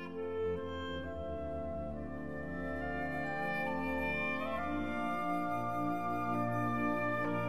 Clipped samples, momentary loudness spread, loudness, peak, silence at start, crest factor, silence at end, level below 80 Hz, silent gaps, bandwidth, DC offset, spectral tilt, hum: under 0.1%; 7 LU; -37 LUFS; -24 dBFS; 0 s; 14 dB; 0 s; -54 dBFS; none; 15.5 kHz; 0.4%; -7.5 dB/octave; none